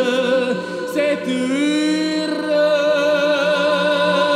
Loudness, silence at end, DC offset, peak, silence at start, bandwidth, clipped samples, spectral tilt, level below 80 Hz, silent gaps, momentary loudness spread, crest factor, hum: -18 LUFS; 0 s; under 0.1%; -4 dBFS; 0 s; 14 kHz; under 0.1%; -4.5 dB/octave; -68 dBFS; none; 4 LU; 12 dB; none